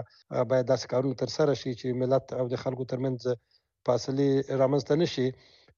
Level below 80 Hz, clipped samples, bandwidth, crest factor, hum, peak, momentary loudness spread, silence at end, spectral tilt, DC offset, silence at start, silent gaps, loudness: -66 dBFS; under 0.1%; 7.2 kHz; 16 dB; none; -12 dBFS; 7 LU; 0.45 s; -6.5 dB/octave; under 0.1%; 0 s; none; -28 LUFS